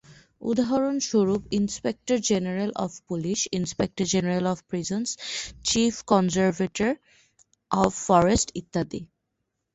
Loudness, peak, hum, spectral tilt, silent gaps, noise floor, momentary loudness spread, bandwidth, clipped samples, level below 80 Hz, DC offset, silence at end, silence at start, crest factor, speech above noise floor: -25 LUFS; -6 dBFS; none; -4.5 dB/octave; none; -79 dBFS; 9 LU; 8.4 kHz; under 0.1%; -50 dBFS; under 0.1%; 0.7 s; 0.1 s; 20 dB; 55 dB